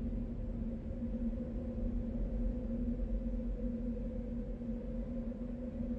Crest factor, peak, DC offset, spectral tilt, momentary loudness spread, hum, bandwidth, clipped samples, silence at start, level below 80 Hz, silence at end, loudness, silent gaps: 12 dB; -26 dBFS; under 0.1%; -11 dB/octave; 3 LU; none; 3.6 kHz; under 0.1%; 0 s; -40 dBFS; 0 s; -41 LUFS; none